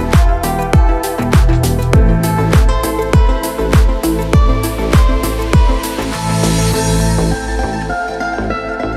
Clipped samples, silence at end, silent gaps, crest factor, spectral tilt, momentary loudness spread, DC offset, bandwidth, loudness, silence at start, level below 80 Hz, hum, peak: under 0.1%; 0 s; none; 12 dB; -6 dB/octave; 7 LU; under 0.1%; 15.5 kHz; -14 LUFS; 0 s; -14 dBFS; none; 0 dBFS